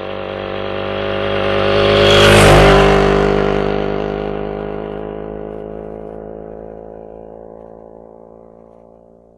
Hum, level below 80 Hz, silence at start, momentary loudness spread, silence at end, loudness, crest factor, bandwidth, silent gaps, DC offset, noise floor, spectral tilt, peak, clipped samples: none; -28 dBFS; 0 s; 25 LU; 1.75 s; -13 LUFS; 14 dB; 13.5 kHz; none; under 0.1%; -45 dBFS; -5 dB/octave; 0 dBFS; under 0.1%